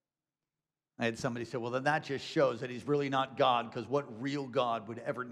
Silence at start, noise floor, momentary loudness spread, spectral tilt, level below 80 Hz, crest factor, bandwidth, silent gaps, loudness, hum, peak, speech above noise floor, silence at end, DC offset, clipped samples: 1 s; under -90 dBFS; 8 LU; -5.5 dB/octave; -76 dBFS; 18 dB; 12.5 kHz; none; -33 LUFS; none; -16 dBFS; over 57 dB; 0 s; under 0.1%; under 0.1%